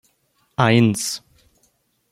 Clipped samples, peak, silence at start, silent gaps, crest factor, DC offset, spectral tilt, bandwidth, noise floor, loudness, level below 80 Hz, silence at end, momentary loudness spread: under 0.1%; -2 dBFS; 0.6 s; none; 20 dB; under 0.1%; -5 dB/octave; 15 kHz; -65 dBFS; -19 LUFS; -56 dBFS; 0.95 s; 16 LU